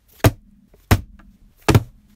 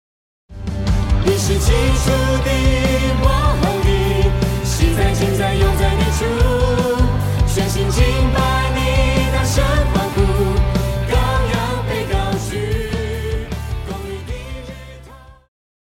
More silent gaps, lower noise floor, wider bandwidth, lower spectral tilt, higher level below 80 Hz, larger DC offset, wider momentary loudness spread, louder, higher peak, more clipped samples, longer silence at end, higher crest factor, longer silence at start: neither; first, -52 dBFS vs -40 dBFS; about the same, 16.5 kHz vs 16.5 kHz; about the same, -6 dB/octave vs -5.5 dB/octave; second, -32 dBFS vs -20 dBFS; neither; second, 3 LU vs 10 LU; second, -20 LUFS vs -17 LUFS; about the same, -2 dBFS vs 0 dBFS; neither; second, 0.3 s vs 0.6 s; about the same, 20 dB vs 16 dB; second, 0.25 s vs 0.5 s